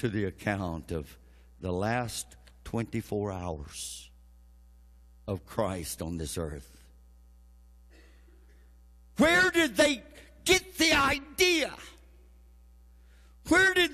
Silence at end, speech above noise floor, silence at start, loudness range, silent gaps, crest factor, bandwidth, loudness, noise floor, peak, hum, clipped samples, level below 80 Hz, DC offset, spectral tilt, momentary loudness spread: 0 s; 27 dB; 0 s; 13 LU; none; 20 dB; 14 kHz; -28 LUFS; -56 dBFS; -10 dBFS; none; under 0.1%; -50 dBFS; under 0.1%; -3.5 dB/octave; 21 LU